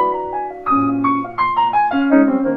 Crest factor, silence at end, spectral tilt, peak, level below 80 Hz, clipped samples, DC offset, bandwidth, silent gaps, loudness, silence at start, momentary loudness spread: 16 dB; 0 s; -8.5 dB/octave; 0 dBFS; -52 dBFS; under 0.1%; under 0.1%; 4.6 kHz; none; -16 LUFS; 0 s; 8 LU